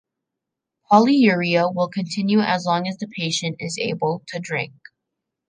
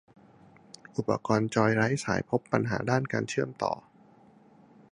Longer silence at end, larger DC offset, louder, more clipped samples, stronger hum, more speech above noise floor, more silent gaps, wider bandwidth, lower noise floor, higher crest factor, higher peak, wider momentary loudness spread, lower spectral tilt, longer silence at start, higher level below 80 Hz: second, 0.8 s vs 1.1 s; neither; first, -20 LUFS vs -29 LUFS; neither; neither; first, 63 dB vs 30 dB; neither; second, 9.8 kHz vs 11 kHz; first, -83 dBFS vs -58 dBFS; about the same, 20 dB vs 24 dB; first, -2 dBFS vs -6 dBFS; first, 11 LU vs 8 LU; about the same, -5 dB/octave vs -6 dB/octave; about the same, 0.9 s vs 0.95 s; second, -70 dBFS vs -62 dBFS